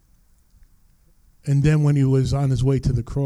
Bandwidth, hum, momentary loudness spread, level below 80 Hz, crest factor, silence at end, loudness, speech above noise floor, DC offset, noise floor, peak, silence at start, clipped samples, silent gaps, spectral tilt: 10.5 kHz; none; 6 LU; -36 dBFS; 14 dB; 0 s; -20 LUFS; 38 dB; under 0.1%; -56 dBFS; -8 dBFS; 1.45 s; under 0.1%; none; -8 dB/octave